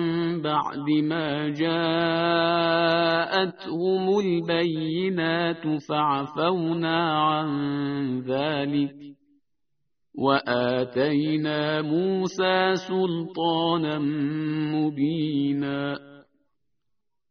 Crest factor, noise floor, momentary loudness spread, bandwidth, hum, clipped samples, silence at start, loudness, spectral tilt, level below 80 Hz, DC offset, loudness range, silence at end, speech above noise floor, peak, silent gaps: 20 dB; -82 dBFS; 5 LU; 6.4 kHz; none; under 0.1%; 0 s; -25 LUFS; -4 dB/octave; -66 dBFS; under 0.1%; 4 LU; 1.1 s; 58 dB; -6 dBFS; none